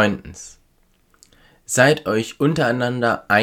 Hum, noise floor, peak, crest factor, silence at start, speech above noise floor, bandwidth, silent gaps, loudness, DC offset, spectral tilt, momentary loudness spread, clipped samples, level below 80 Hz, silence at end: none; -59 dBFS; 0 dBFS; 20 dB; 0 s; 41 dB; 19 kHz; none; -19 LUFS; under 0.1%; -4.5 dB/octave; 21 LU; under 0.1%; -52 dBFS; 0 s